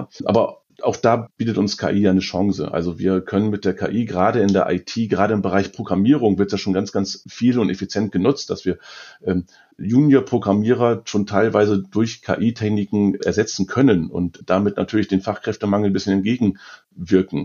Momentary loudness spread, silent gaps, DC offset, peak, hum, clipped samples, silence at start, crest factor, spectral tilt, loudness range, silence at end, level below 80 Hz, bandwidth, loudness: 8 LU; none; under 0.1%; -2 dBFS; none; under 0.1%; 0 s; 18 dB; -6.5 dB/octave; 2 LU; 0 s; -54 dBFS; 7.2 kHz; -19 LUFS